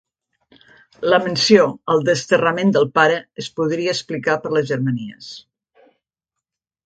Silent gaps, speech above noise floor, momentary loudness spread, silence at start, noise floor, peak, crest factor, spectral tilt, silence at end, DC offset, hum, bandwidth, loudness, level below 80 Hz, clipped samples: none; 66 dB; 14 LU; 1 s; -84 dBFS; 0 dBFS; 20 dB; -5 dB/octave; 1.45 s; under 0.1%; none; 9.2 kHz; -18 LUFS; -62 dBFS; under 0.1%